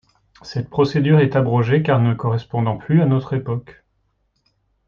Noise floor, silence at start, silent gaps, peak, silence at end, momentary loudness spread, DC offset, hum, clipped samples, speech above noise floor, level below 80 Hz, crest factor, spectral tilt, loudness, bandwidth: -67 dBFS; 0.45 s; none; -4 dBFS; 1.15 s; 11 LU; under 0.1%; none; under 0.1%; 49 dB; -52 dBFS; 16 dB; -9 dB/octave; -18 LUFS; 6.8 kHz